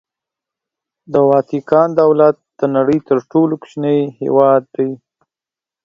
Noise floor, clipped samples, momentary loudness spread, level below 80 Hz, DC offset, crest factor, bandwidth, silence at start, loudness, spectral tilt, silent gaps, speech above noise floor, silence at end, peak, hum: -89 dBFS; under 0.1%; 9 LU; -60 dBFS; under 0.1%; 16 dB; 7.2 kHz; 1.1 s; -14 LUFS; -9 dB/octave; none; 75 dB; 0.9 s; 0 dBFS; none